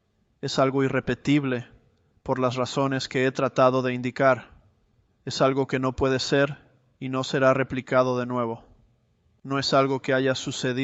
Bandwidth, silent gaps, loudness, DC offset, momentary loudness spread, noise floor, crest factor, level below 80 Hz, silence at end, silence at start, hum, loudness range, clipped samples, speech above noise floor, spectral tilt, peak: 8.2 kHz; none; -24 LUFS; under 0.1%; 10 LU; -66 dBFS; 20 dB; -54 dBFS; 0 s; 0.45 s; none; 2 LU; under 0.1%; 42 dB; -5.5 dB/octave; -6 dBFS